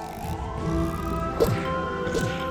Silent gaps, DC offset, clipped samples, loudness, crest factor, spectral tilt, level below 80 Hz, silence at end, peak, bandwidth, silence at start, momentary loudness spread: none; under 0.1%; under 0.1%; -27 LUFS; 18 dB; -6 dB/octave; -36 dBFS; 0 s; -8 dBFS; 19 kHz; 0 s; 7 LU